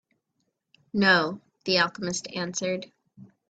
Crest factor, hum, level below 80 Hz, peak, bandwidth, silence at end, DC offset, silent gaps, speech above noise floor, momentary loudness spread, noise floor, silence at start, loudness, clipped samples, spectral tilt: 22 dB; none; -68 dBFS; -6 dBFS; 9.2 kHz; 0.25 s; under 0.1%; none; 52 dB; 12 LU; -78 dBFS; 0.95 s; -25 LUFS; under 0.1%; -3.5 dB/octave